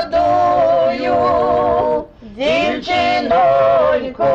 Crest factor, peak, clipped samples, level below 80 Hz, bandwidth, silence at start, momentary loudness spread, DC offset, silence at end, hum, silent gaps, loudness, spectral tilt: 8 dB; -6 dBFS; under 0.1%; -42 dBFS; 7.8 kHz; 0 s; 5 LU; under 0.1%; 0 s; none; none; -15 LUFS; -5.5 dB/octave